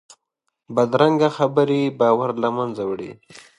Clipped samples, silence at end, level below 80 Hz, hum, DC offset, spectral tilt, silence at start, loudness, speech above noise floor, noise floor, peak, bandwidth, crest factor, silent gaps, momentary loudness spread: under 0.1%; 0.2 s; -66 dBFS; none; under 0.1%; -7 dB/octave; 0.7 s; -20 LUFS; 57 dB; -77 dBFS; -2 dBFS; 11 kHz; 18 dB; none; 10 LU